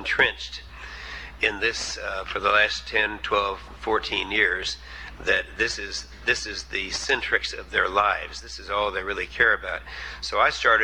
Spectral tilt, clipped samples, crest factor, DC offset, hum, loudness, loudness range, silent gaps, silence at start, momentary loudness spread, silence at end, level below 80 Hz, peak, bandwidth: -2 dB/octave; under 0.1%; 20 dB; 0.2%; none; -24 LUFS; 2 LU; none; 0 s; 14 LU; 0 s; -44 dBFS; -6 dBFS; over 20 kHz